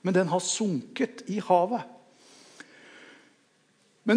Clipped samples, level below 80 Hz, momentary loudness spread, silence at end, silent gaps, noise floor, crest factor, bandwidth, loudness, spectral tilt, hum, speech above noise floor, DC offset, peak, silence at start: under 0.1%; -86 dBFS; 25 LU; 0 s; none; -66 dBFS; 20 dB; 10.5 kHz; -27 LUFS; -4.5 dB/octave; none; 39 dB; under 0.1%; -8 dBFS; 0.05 s